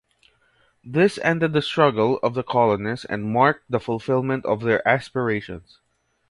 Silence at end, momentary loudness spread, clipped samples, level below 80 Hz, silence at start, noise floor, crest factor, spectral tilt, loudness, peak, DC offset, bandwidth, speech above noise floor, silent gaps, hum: 0.7 s; 8 LU; under 0.1%; -56 dBFS; 0.85 s; -62 dBFS; 20 dB; -7 dB/octave; -21 LUFS; -2 dBFS; under 0.1%; 11.5 kHz; 41 dB; none; none